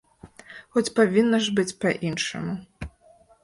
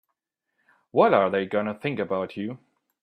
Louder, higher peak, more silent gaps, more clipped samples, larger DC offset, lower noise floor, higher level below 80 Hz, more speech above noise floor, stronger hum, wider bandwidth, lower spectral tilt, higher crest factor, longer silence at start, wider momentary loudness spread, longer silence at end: about the same, -24 LUFS vs -24 LUFS; about the same, -6 dBFS vs -4 dBFS; neither; neither; neither; second, -56 dBFS vs -80 dBFS; first, -52 dBFS vs -72 dBFS; second, 33 dB vs 57 dB; neither; first, 11.5 kHz vs 5.4 kHz; second, -4.5 dB/octave vs -8 dB/octave; about the same, 18 dB vs 22 dB; second, 0.25 s vs 0.95 s; first, 21 LU vs 15 LU; about the same, 0.55 s vs 0.45 s